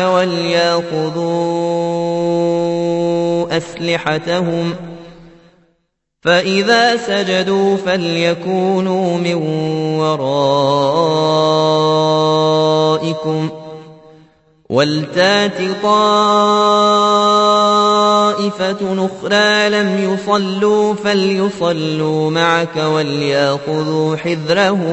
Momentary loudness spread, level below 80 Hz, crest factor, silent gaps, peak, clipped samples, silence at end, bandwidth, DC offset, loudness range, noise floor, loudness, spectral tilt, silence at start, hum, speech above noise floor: 7 LU; -56 dBFS; 14 dB; none; 0 dBFS; under 0.1%; 0 s; 8.4 kHz; under 0.1%; 5 LU; -68 dBFS; -14 LUFS; -5 dB/octave; 0 s; none; 54 dB